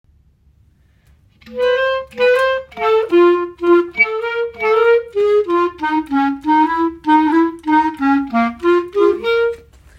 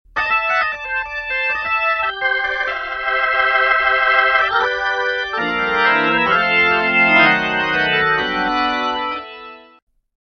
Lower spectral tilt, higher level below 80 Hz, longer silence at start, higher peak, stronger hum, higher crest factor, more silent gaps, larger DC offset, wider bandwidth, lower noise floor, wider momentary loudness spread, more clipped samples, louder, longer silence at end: about the same, -5.5 dB/octave vs -4.5 dB/octave; about the same, -50 dBFS vs -48 dBFS; first, 1.45 s vs 0.15 s; about the same, -2 dBFS vs 0 dBFS; neither; about the same, 14 dB vs 16 dB; neither; neither; first, 11 kHz vs 6.6 kHz; first, -53 dBFS vs -38 dBFS; about the same, 7 LU vs 8 LU; neither; about the same, -15 LUFS vs -16 LUFS; second, 0.4 s vs 0.65 s